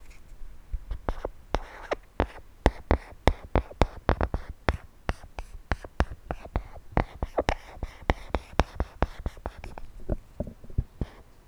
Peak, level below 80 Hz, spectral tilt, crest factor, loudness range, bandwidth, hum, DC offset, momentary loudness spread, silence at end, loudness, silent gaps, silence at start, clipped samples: 0 dBFS; -34 dBFS; -6.5 dB/octave; 30 dB; 4 LU; 13.5 kHz; none; under 0.1%; 14 LU; 0.25 s; -32 LUFS; none; 0 s; under 0.1%